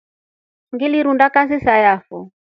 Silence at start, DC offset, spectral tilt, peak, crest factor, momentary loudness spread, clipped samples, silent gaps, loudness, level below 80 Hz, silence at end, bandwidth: 0.75 s; under 0.1%; -7.5 dB/octave; 0 dBFS; 18 dB; 18 LU; under 0.1%; none; -15 LUFS; -50 dBFS; 0.25 s; 5.8 kHz